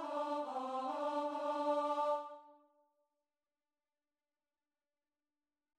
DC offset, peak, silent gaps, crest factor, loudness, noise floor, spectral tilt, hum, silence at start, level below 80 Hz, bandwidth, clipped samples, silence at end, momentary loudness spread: under 0.1%; -26 dBFS; none; 16 dB; -39 LUFS; under -90 dBFS; -3 dB/octave; none; 0 s; under -90 dBFS; 11.5 kHz; under 0.1%; 3.25 s; 6 LU